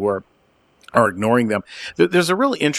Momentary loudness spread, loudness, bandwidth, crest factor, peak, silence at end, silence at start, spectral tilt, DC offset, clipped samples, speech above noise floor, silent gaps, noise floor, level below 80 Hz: 8 LU; -19 LUFS; 14.5 kHz; 20 dB; 0 dBFS; 0 s; 0 s; -5 dB/octave; under 0.1%; under 0.1%; 41 dB; none; -59 dBFS; -58 dBFS